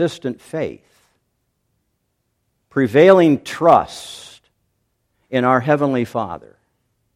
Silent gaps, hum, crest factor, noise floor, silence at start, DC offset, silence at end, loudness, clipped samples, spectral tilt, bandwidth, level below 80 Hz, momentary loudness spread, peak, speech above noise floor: none; none; 18 dB; -71 dBFS; 0 s; under 0.1%; 0.75 s; -16 LUFS; under 0.1%; -6.5 dB/octave; 15 kHz; -58 dBFS; 19 LU; 0 dBFS; 55 dB